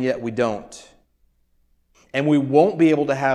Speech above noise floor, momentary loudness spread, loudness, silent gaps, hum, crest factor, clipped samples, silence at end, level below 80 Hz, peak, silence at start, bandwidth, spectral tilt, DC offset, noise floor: 44 dB; 13 LU; -19 LUFS; none; none; 18 dB; under 0.1%; 0 s; -60 dBFS; -4 dBFS; 0 s; 10.5 kHz; -7 dB/octave; under 0.1%; -63 dBFS